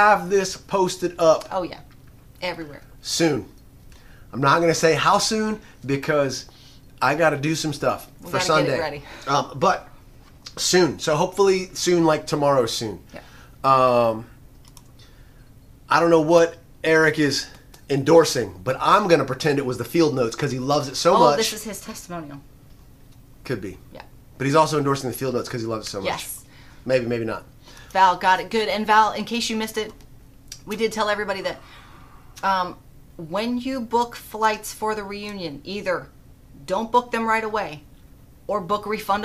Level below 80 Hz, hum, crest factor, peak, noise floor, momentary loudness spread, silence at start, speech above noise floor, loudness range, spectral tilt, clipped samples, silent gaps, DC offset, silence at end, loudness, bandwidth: -50 dBFS; none; 20 dB; -2 dBFS; -48 dBFS; 16 LU; 0 s; 26 dB; 7 LU; -4.5 dB/octave; under 0.1%; none; under 0.1%; 0 s; -21 LUFS; 15.5 kHz